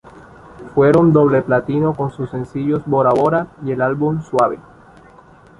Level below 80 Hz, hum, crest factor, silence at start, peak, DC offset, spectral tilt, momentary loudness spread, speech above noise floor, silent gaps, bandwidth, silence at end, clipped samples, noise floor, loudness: -48 dBFS; none; 16 dB; 0.15 s; -2 dBFS; under 0.1%; -9 dB/octave; 11 LU; 29 dB; none; 11 kHz; 1 s; under 0.1%; -45 dBFS; -16 LUFS